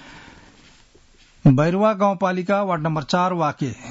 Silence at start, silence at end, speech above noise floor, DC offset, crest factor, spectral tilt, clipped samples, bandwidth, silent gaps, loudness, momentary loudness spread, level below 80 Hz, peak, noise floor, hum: 0.05 s; 0 s; 33 dB; under 0.1%; 16 dB; -7.5 dB/octave; under 0.1%; 8 kHz; none; -20 LUFS; 6 LU; -52 dBFS; -6 dBFS; -52 dBFS; none